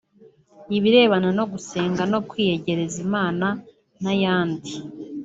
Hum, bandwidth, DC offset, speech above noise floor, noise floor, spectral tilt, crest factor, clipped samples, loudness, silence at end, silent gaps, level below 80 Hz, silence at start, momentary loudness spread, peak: none; 8 kHz; under 0.1%; 32 dB; -53 dBFS; -5.5 dB/octave; 20 dB; under 0.1%; -22 LUFS; 0 s; none; -60 dBFS; 0.6 s; 15 LU; -4 dBFS